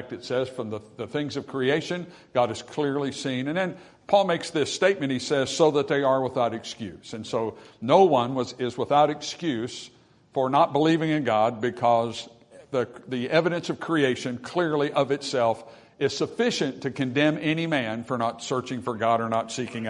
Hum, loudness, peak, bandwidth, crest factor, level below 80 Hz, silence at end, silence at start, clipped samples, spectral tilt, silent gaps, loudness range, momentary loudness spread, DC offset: none; -25 LUFS; -4 dBFS; 11 kHz; 20 dB; -68 dBFS; 0 s; 0 s; under 0.1%; -5 dB/octave; none; 3 LU; 11 LU; under 0.1%